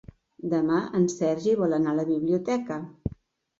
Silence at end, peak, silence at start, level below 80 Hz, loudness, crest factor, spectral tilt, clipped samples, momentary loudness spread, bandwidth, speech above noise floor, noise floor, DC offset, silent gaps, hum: 0.5 s; -12 dBFS; 0.45 s; -52 dBFS; -26 LUFS; 14 dB; -7 dB/octave; under 0.1%; 12 LU; 7.8 kHz; 26 dB; -51 dBFS; under 0.1%; none; none